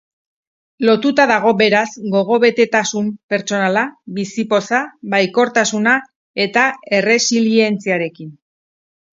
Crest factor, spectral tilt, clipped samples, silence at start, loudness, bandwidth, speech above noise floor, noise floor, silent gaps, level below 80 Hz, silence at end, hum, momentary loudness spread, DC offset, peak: 16 dB; -4 dB/octave; under 0.1%; 0.8 s; -15 LUFS; 7.8 kHz; over 75 dB; under -90 dBFS; 3.23-3.29 s, 6.16-6.34 s; -64 dBFS; 0.85 s; none; 9 LU; under 0.1%; 0 dBFS